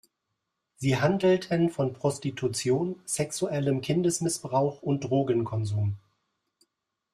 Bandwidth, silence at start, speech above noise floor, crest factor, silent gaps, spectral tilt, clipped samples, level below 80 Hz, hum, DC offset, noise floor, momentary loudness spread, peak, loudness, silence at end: 15 kHz; 0.8 s; 55 dB; 18 dB; none; -5.5 dB/octave; under 0.1%; -62 dBFS; none; under 0.1%; -82 dBFS; 6 LU; -10 dBFS; -27 LUFS; 1.15 s